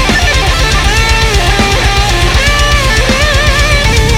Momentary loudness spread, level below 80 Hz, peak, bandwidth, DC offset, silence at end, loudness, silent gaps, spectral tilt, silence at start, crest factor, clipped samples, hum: 1 LU; -12 dBFS; 0 dBFS; 16.5 kHz; under 0.1%; 0 s; -9 LUFS; none; -3.5 dB/octave; 0 s; 8 dB; under 0.1%; none